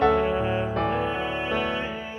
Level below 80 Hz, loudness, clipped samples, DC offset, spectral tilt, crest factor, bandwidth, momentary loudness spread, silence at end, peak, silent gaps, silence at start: -42 dBFS; -26 LUFS; under 0.1%; under 0.1%; -7 dB/octave; 18 dB; 11 kHz; 4 LU; 0 s; -8 dBFS; none; 0 s